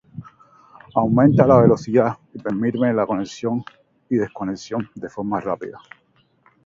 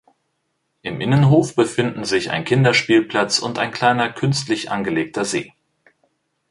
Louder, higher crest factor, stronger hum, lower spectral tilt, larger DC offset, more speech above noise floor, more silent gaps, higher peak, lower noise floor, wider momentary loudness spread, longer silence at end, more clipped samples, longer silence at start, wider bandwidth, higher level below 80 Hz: about the same, -20 LUFS vs -18 LUFS; about the same, 20 dB vs 18 dB; neither; first, -8.5 dB/octave vs -5 dB/octave; neither; second, 42 dB vs 53 dB; neither; about the same, 0 dBFS vs -2 dBFS; second, -61 dBFS vs -71 dBFS; first, 16 LU vs 9 LU; second, 0.9 s vs 1.05 s; neither; second, 0.15 s vs 0.85 s; second, 7.6 kHz vs 11.5 kHz; about the same, -52 dBFS vs -56 dBFS